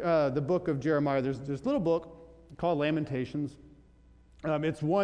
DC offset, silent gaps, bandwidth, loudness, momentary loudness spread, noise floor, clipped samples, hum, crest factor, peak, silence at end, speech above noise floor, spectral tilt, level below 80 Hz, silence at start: under 0.1%; none; 10 kHz; -30 LUFS; 8 LU; -59 dBFS; under 0.1%; none; 14 dB; -16 dBFS; 0 s; 29 dB; -8 dB/octave; -58 dBFS; 0 s